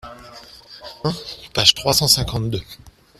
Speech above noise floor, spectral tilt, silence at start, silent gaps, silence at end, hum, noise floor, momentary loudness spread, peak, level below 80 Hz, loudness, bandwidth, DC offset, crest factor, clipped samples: 23 dB; -3 dB/octave; 0.05 s; none; 0.3 s; none; -42 dBFS; 23 LU; 0 dBFS; -42 dBFS; -17 LUFS; 16 kHz; under 0.1%; 22 dB; under 0.1%